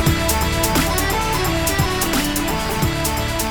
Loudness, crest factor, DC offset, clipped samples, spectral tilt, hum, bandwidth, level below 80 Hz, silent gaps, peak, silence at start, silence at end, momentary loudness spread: -19 LUFS; 16 dB; under 0.1%; under 0.1%; -4 dB/octave; none; over 20 kHz; -28 dBFS; none; -4 dBFS; 0 s; 0 s; 3 LU